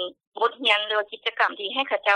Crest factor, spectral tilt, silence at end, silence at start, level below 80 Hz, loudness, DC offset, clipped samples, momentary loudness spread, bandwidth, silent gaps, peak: 16 dB; -1 dB/octave; 0 s; 0 s; -78 dBFS; -24 LUFS; under 0.1%; under 0.1%; 7 LU; 10.5 kHz; 0.27-0.32 s; -8 dBFS